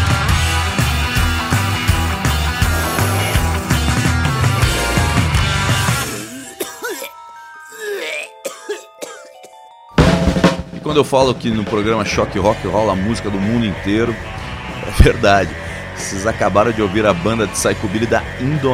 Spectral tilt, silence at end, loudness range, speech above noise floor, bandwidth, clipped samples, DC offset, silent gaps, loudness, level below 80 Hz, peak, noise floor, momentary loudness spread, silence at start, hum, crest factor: -5 dB/octave; 0 s; 6 LU; 25 dB; 16.5 kHz; under 0.1%; under 0.1%; none; -17 LUFS; -26 dBFS; 0 dBFS; -40 dBFS; 13 LU; 0 s; none; 16 dB